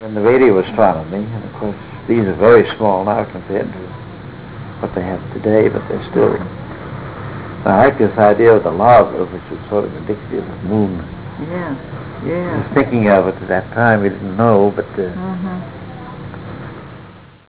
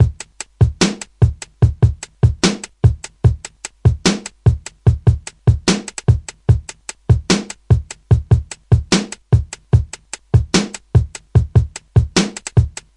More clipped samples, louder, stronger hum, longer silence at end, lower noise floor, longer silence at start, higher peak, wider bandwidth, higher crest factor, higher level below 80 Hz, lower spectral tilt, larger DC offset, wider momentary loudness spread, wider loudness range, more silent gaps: neither; about the same, -15 LUFS vs -17 LUFS; neither; about the same, 0.25 s vs 0.25 s; first, -39 dBFS vs -35 dBFS; about the same, 0 s vs 0 s; about the same, 0 dBFS vs 0 dBFS; second, 4 kHz vs 11 kHz; about the same, 16 dB vs 16 dB; second, -42 dBFS vs -26 dBFS; first, -11.5 dB/octave vs -5.5 dB/octave; first, 0.4% vs under 0.1%; first, 20 LU vs 3 LU; first, 6 LU vs 1 LU; neither